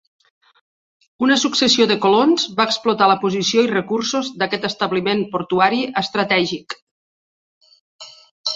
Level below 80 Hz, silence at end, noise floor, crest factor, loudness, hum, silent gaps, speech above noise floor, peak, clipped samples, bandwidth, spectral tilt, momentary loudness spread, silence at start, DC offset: -62 dBFS; 0 s; under -90 dBFS; 18 dB; -17 LUFS; none; 6.82-7.61 s, 7.81-7.99 s, 8.31-8.44 s; over 73 dB; -2 dBFS; under 0.1%; 8 kHz; -3.5 dB/octave; 7 LU; 1.2 s; under 0.1%